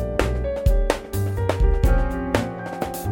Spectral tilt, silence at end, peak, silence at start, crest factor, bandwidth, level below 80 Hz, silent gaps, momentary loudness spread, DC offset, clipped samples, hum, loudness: -6.5 dB/octave; 0 s; 0 dBFS; 0 s; 20 dB; 17 kHz; -24 dBFS; none; 7 LU; under 0.1%; under 0.1%; none; -23 LUFS